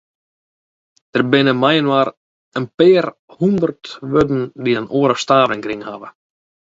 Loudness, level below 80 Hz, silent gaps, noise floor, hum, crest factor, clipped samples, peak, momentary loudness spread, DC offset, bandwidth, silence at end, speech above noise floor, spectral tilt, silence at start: -16 LUFS; -54 dBFS; 2.17-2.52 s, 2.74-2.78 s, 3.19-3.28 s; under -90 dBFS; none; 18 dB; under 0.1%; 0 dBFS; 14 LU; under 0.1%; 8 kHz; 0.6 s; over 74 dB; -6 dB/octave; 1.15 s